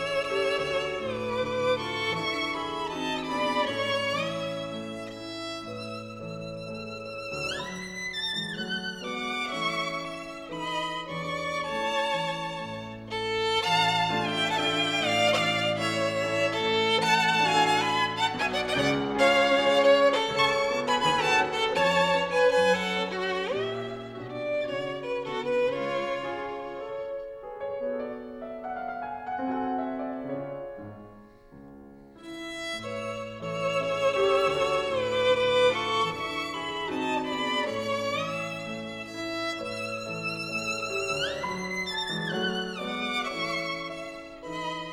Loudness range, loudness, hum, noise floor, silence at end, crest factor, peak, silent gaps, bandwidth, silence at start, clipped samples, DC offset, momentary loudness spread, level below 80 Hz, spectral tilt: 11 LU; -28 LUFS; none; -50 dBFS; 0 s; 18 dB; -10 dBFS; none; 15.5 kHz; 0 s; under 0.1%; under 0.1%; 14 LU; -58 dBFS; -3.5 dB/octave